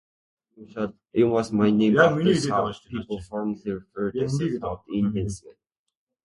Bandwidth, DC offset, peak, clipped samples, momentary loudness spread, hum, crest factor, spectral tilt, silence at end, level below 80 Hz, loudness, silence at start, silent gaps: 11.5 kHz; under 0.1%; -4 dBFS; under 0.1%; 14 LU; none; 20 dB; -6.5 dB/octave; 0.75 s; -52 dBFS; -24 LUFS; 0.6 s; none